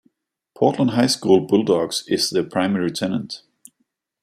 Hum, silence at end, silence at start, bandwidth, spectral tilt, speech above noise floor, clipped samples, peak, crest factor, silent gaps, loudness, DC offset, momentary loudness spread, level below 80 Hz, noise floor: none; 0.85 s; 0.6 s; 15 kHz; -5 dB/octave; 53 dB; under 0.1%; -2 dBFS; 18 dB; none; -19 LUFS; under 0.1%; 9 LU; -64 dBFS; -72 dBFS